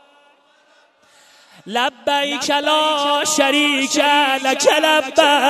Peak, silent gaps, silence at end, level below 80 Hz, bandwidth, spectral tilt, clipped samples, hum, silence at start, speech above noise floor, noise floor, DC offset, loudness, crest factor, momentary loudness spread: 0 dBFS; none; 0 s; -68 dBFS; 13.5 kHz; -0.5 dB/octave; under 0.1%; none; 1.65 s; 38 dB; -54 dBFS; under 0.1%; -16 LUFS; 18 dB; 5 LU